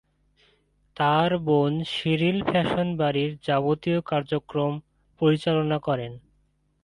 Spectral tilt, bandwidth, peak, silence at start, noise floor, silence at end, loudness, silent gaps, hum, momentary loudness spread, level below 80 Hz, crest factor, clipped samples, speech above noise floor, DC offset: -7.5 dB/octave; 11 kHz; -8 dBFS; 1 s; -67 dBFS; 0.65 s; -24 LUFS; none; none; 6 LU; -58 dBFS; 16 dB; under 0.1%; 43 dB; under 0.1%